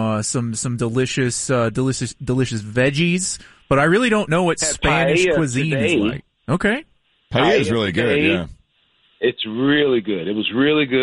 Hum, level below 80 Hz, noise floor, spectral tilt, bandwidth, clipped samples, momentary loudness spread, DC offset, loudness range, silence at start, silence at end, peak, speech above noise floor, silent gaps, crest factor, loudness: none; -44 dBFS; -61 dBFS; -4.5 dB/octave; 11.5 kHz; under 0.1%; 7 LU; under 0.1%; 3 LU; 0 s; 0 s; -4 dBFS; 43 dB; none; 14 dB; -19 LUFS